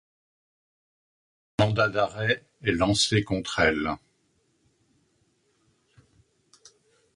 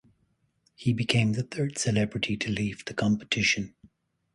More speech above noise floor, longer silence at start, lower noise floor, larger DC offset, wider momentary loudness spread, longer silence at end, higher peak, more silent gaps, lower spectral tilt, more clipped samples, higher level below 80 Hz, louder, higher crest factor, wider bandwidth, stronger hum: about the same, 45 dB vs 44 dB; first, 1.6 s vs 0.8 s; about the same, -70 dBFS vs -71 dBFS; neither; about the same, 8 LU vs 7 LU; first, 3.2 s vs 0.65 s; about the same, -6 dBFS vs -8 dBFS; neither; about the same, -4.5 dB/octave vs -4.5 dB/octave; neither; first, -50 dBFS vs -56 dBFS; about the same, -25 LUFS vs -27 LUFS; about the same, 24 dB vs 22 dB; about the same, 11 kHz vs 11.5 kHz; neither